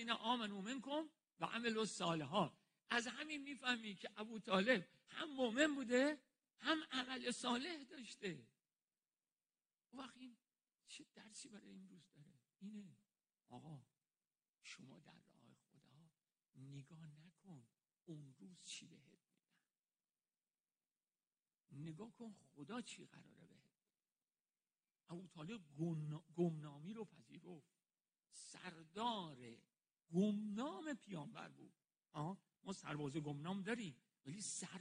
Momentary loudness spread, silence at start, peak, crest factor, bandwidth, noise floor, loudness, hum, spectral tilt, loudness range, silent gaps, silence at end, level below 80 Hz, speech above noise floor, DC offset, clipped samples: 21 LU; 0 s; -22 dBFS; 26 dB; 10 kHz; under -90 dBFS; -45 LUFS; none; -4.5 dB/octave; 21 LU; 20.60-20.64 s, 21.27-21.31 s; 0 s; -88 dBFS; over 44 dB; under 0.1%; under 0.1%